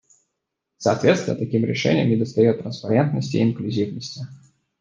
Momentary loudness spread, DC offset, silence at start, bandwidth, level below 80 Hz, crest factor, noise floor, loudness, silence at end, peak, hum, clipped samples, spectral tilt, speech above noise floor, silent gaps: 10 LU; under 0.1%; 0.8 s; 7.6 kHz; -60 dBFS; 20 dB; -80 dBFS; -21 LUFS; 0.45 s; -2 dBFS; none; under 0.1%; -6.5 dB/octave; 59 dB; none